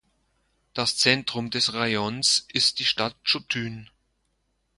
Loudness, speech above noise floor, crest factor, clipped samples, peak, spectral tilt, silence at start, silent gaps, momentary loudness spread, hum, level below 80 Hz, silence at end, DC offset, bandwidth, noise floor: -23 LUFS; 47 dB; 24 dB; under 0.1%; -4 dBFS; -2 dB/octave; 0.75 s; none; 9 LU; none; -62 dBFS; 0.95 s; under 0.1%; 11.5 kHz; -73 dBFS